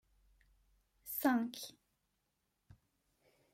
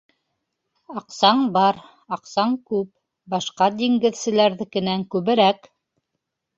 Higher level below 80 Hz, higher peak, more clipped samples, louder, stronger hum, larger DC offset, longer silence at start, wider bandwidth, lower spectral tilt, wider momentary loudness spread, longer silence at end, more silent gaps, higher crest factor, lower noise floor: second, -76 dBFS vs -66 dBFS; second, -20 dBFS vs -2 dBFS; neither; second, -37 LUFS vs -20 LUFS; neither; neither; first, 1.05 s vs 0.9 s; first, 16 kHz vs 7.8 kHz; second, -3.5 dB/octave vs -5 dB/octave; first, 18 LU vs 15 LU; first, 1.85 s vs 1 s; neither; about the same, 22 dB vs 20 dB; first, -84 dBFS vs -79 dBFS